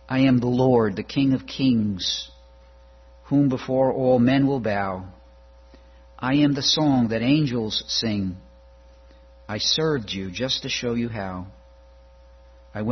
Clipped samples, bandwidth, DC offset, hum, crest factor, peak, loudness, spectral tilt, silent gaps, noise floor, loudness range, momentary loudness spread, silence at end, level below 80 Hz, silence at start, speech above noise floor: under 0.1%; 6.4 kHz; under 0.1%; none; 16 dB; -6 dBFS; -22 LUFS; -5.5 dB/octave; none; -50 dBFS; 4 LU; 13 LU; 0 s; -50 dBFS; 0.1 s; 28 dB